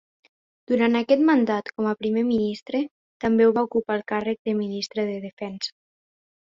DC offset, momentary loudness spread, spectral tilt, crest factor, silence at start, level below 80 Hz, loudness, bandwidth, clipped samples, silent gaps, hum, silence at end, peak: under 0.1%; 12 LU; -6 dB/octave; 18 dB; 0.7 s; -64 dBFS; -24 LUFS; 7.6 kHz; under 0.1%; 2.62-2.66 s, 2.91-3.20 s, 4.39-4.45 s, 5.33-5.37 s; none; 0.8 s; -6 dBFS